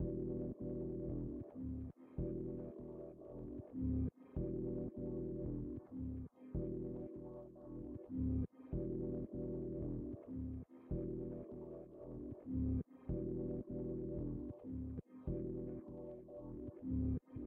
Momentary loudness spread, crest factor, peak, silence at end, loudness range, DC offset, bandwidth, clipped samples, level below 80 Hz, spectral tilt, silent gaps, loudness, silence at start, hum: 10 LU; 14 dB; -30 dBFS; 0 s; 2 LU; under 0.1%; 2.6 kHz; under 0.1%; -52 dBFS; -13 dB/octave; none; -45 LUFS; 0 s; none